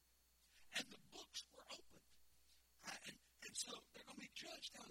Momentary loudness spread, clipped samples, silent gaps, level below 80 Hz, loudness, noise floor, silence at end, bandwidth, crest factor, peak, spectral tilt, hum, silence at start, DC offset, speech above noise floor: 10 LU; under 0.1%; none; -82 dBFS; -53 LUFS; -77 dBFS; 0 s; 16.5 kHz; 26 dB; -32 dBFS; -0.5 dB/octave; none; 0 s; under 0.1%; 22 dB